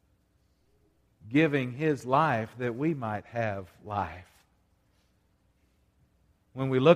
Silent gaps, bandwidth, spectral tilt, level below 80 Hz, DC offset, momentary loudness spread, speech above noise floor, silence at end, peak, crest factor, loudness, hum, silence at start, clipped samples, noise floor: none; 14 kHz; -7.5 dB/octave; -64 dBFS; under 0.1%; 12 LU; 42 dB; 0 s; -6 dBFS; 24 dB; -29 LUFS; none; 1.25 s; under 0.1%; -69 dBFS